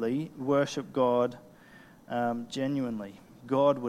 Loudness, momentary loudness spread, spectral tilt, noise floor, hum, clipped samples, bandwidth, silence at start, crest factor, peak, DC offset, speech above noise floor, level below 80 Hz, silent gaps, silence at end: -30 LUFS; 13 LU; -6.5 dB/octave; -54 dBFS; none; under 0.1%; 14 kHz; 0 s; 16 dB; -14 dBFS; under 0.1%; 25 dB; -68 dBFS; none; 0 s